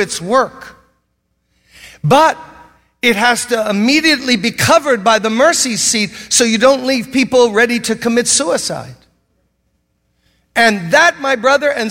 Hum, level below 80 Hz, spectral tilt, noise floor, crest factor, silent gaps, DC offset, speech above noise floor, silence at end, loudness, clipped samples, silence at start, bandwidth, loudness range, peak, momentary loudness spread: none; -52 dBFS; -3 dB/octave; -66 dBFS; 14 dB; none; under 0.1%; 53 dB; 0 s; -12 LUFS; under 0.1%; 0 s; 16.5 kHz; 4 LU; 0 dBFS; 6 LU